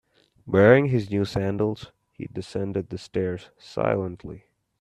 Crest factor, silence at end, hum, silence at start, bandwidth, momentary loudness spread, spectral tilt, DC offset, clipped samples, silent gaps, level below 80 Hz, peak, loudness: 22 dB; 0.45 s; none; 0.45 s; 11.5 kHz; 20 LU; -7.5 dB/octave; under 0.1%; under 0.1%; none; -54 dBFS; -4 dBFS; -24 LUFS